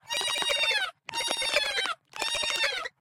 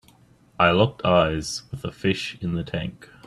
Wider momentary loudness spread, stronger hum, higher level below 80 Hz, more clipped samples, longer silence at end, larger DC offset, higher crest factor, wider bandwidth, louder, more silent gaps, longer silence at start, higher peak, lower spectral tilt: second, 7 LU vs 12 LU; neither; second, -62 dBFS vs -48 dBFS; neither; about the same, 0.1 s vs 0.2 s; neither; about the same, 22 dB vs 20 dB; first, 17.5 kHz vs 12.5 kHz; second, -27 LUFS vs -23 LUFS; neither; second, 0.05 s vs 0.6 s; second, -8 dBFS vs -4 dBFS; second, 1 dB/octave vs -5.5 dB/octave